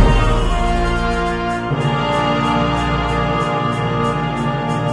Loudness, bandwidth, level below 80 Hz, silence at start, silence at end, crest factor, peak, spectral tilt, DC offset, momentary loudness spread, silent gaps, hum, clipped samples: -18 LUFS; 10.5 kHz; -22 dBFS; 0 s; 0 s; 16 dB; 0 dBFS; -6.5 dB/octave; under 0.1%; 3 LU; none; none; under 0.1%